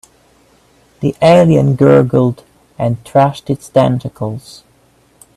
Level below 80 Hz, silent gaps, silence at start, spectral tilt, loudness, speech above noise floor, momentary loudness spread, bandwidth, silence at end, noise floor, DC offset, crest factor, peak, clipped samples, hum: -46 dBFS; none; 1 s; -8 dB/octave; -12 LUFS; 40 dB; 14 LU; 12.5 kHz; 0.95 s; -51 dBFS; under 0.1%; 14 dB; 0 dBFS; under 0.1%; none